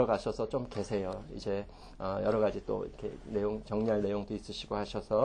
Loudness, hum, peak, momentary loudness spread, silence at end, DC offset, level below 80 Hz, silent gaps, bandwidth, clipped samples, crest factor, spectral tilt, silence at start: -35 LUFS; none; -14 dBFS; 9 LU; 0 s; under 0.1%; -52 dBFS; none; 10 kHz; under 0.1%; 20 dB; -6.5 dB/octave; 0 s